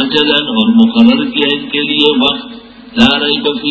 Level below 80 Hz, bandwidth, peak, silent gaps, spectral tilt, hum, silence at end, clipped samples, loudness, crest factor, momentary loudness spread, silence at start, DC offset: -46 dBFS; 8 kHz; 0 dBFS; none; -5.5 dB/octave; none; 0 s; 0.4%; -10 LUFS; 12 dB; 6 LU; 0 s; under 0.1%